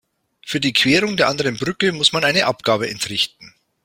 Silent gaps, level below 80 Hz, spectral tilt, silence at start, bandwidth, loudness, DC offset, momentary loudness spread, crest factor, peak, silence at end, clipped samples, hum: none; -54 dBFS; -3.5 dB/octave; 0.45 s; 16.5 kHz; -17 LUFS; under 0.1%; 7 LU; 20 dB; 0 dBFS; 0.35 s; under 0.1%; none